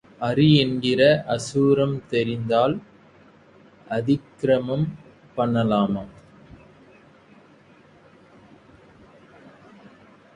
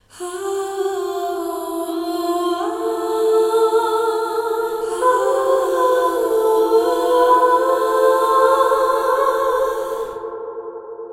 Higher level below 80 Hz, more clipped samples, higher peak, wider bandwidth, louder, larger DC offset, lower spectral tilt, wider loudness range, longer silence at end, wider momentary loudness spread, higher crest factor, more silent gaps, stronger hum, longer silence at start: about the same, -56 dBFS vs -56 dBFS; neither; about the same, -4 dBFS vs -4 dBFS; second, 11.5 kHz vs 16.5 kHz; second, -22 LUFS vs -18 LUFS; neither; first, -6.5 dB/octave vs -3 dB/octave; first, 8 LU vs 4 LU; first, 4.25 s vs 0 s; about the same, 12 LU vs 11 LU; first, 20 dB vs 14 dB; neither; neither; about the same, 0.2 s vs 0.15 s